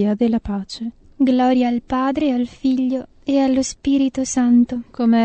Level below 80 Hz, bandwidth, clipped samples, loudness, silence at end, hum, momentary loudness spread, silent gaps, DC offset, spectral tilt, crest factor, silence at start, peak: -46 dBFS; 8.8 kHz; under 0.1%; -19 LUFS; 0 s; none; 10 LU; none; under 0.1%; -5 dB/octave; 12 dB; 0 s; -6 dBFS